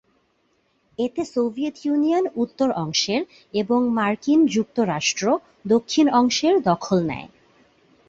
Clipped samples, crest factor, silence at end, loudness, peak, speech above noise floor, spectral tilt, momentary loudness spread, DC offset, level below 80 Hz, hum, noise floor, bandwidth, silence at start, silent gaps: under 0.1%; 18 dB; 0.8 s; -21 LUFS; -4 dBFS; 45 dB; -4.5 dB/octave; 9 LU; under 0.1%; -60 dBFS; none; -66 dBFS; 7.8 kHz; 1 s; none